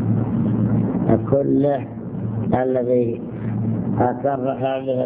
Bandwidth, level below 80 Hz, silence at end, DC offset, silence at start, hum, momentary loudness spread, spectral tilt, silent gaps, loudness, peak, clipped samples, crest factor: 3.8 kHz; -44 dBFS; 0 s; under 0.1%; 0 s; none; 8 LU; -13 dB/octave; none; -21 LUFS; -2 dBFS; under 0.1%; 16 dB